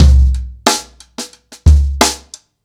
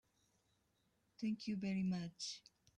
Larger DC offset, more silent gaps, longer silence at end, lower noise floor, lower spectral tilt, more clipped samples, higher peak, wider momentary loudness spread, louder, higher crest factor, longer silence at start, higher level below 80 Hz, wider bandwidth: neither; neither; about the same, 0.5 s vs 0.4 s; second, -37 dBFS vs -81 dBFS; about the same, -4.5 dB/octave vs -5.5 dB/octave; neither; first, 0 dBFS vs -32 dBFS; first, 17 LU vs 7 LU; first, -13 LUFS vs -43 LUFS; about the same, 12 dB vs 14 dB; second, 0 s vs 1.2 s; first, -14 dBFS vs -80 dBFS; first, 15.5 kHz vs 9.8 kHz